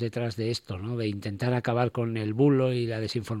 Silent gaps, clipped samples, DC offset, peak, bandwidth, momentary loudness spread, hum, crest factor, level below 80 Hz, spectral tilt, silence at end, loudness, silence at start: none; under 0.1%; under 0.1%; -10 dBFS; 13.5 kHz; 8 LU; none; 16 dB; -62 dBFS; -7 dB/octave; 0 s; -28 LUFS; 0 s